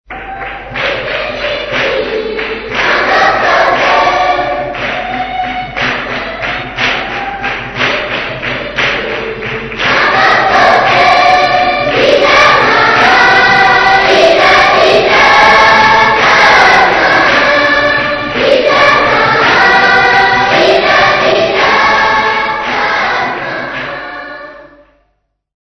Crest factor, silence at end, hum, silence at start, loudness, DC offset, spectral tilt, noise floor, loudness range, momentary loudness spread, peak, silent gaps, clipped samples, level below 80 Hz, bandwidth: 10 dB; 0.95 s; none; 0.1 s; -8 LUFS; under 0.1%; -3.5 dB/octave; -62 dBFS; 9 LU; 12 LU; 0 dBFS; none; 0.6%; -36 dBFS; 11 kHz